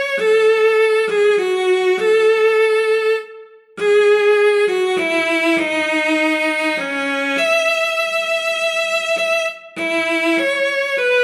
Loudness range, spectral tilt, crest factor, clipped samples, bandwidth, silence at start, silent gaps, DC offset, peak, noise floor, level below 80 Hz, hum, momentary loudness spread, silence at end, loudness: 2 LU; -2.5 dB/octave; 12 dB; under 0.1%; 14 kHz; 0 s; none; under 0.1%; -4 dBFS; -40 dBFS; -84 dBFS; none; 5 LU; 0 s; -16 LUFS